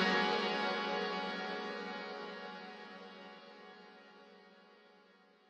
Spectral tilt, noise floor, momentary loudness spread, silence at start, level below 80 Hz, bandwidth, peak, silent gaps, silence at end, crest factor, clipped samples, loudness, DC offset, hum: -4.5 dB/octave; -66 dBFS; 24 LU; 0 s; -88 dBFS; 9.4 kHz; -20 dBFS; none; 0.55 s; 20 dB; under 0.1%; -38 LUFS; under 0.1%; none